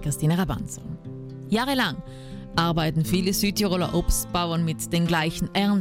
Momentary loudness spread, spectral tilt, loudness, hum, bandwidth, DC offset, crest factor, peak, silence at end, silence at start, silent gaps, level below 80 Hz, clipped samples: 14 LU; -5 dB/octave; -24 LUFS; none; 16.5 kHz; under 0.1%; 14 dB; -10 dBFS; 0 s; 0 s; none; -36 dBFS; under 0.1%